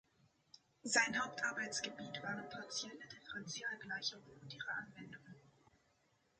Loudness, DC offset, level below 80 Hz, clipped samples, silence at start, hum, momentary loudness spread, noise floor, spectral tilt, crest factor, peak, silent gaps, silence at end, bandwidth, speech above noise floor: -41 LUFS; under 0.1%; -82 dBFS; under 0.1%; 0.55 s; none; 20 LU; -78 dBFS; -1.5 dB/octave; 26 dB; -18 dBFS; none; 0.9 s; 10 kHz; 34 dB